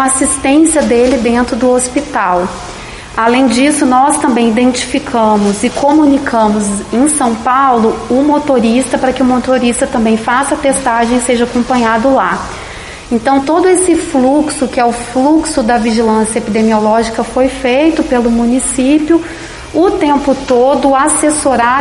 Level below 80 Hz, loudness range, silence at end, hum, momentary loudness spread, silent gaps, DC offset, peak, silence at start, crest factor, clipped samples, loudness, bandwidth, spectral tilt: -34 dBFS; 1 LU; 0 s; none; 5 LU; none; under 0.1%; 0 dBFS; 0 s; 10 dB; under 0.1%; -11 LUFS; 11.5 kHz; -4 dB/octave